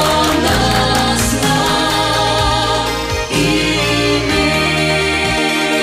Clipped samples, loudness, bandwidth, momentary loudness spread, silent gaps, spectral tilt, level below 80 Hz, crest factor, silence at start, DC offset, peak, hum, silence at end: under 0.1%; -13 LUFS; 16 kHz; 2 LU; none; -3.5 dB/octave; -28 dBFS; 10 dB; 0 s; under 0.1%; -4 dBFS; none; 0 s